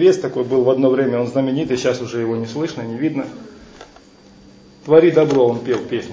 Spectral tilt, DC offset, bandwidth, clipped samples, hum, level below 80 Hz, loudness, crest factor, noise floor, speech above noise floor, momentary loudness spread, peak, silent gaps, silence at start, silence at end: -6.5 dB/octave; under 0.1%; 7.8 kHz; under 0.1%; none; -56 dBFS; -17 LUFS; 16 dB; -45 dBFS; 29 dB; 11 LU; 0 dBFS; none; 0 s; 0 s